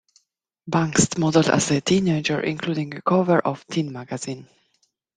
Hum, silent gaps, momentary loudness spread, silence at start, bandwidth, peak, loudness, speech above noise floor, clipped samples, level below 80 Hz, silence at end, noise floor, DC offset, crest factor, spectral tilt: none; none; 12 LU; 0.65 s; 10 kHz; -2 dBFS; -22 LUFS; 50 dB; under 0.1%; -56 dBFS; 0.7 s; -71 dBFS; under 0.1%; 20 dB; -5 dB/octave